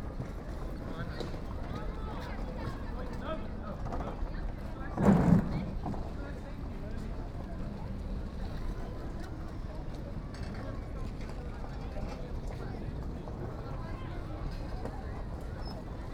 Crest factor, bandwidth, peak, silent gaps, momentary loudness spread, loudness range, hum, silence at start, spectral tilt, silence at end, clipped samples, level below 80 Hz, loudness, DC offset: 24 dB; 14 kHz; -10 dBFS; none; 5 LU; 9 LU; none; 0 s; -8 dB/octave; 0 s; under 0.1%; -40 dBFS; -37 LUFS; under 0.1%